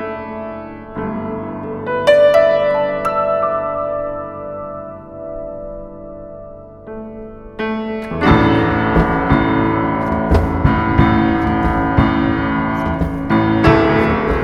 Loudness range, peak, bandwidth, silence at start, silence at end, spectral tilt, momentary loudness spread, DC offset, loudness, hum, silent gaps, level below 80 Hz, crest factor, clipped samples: 13 LU; 0 dBFS; 12 kHz; 0 s; 0 s; -8 dB/octave; 19 LU; under 0.1%; -16 LUFS; none; none; -28 dBFS; 16 dB; under 0.1%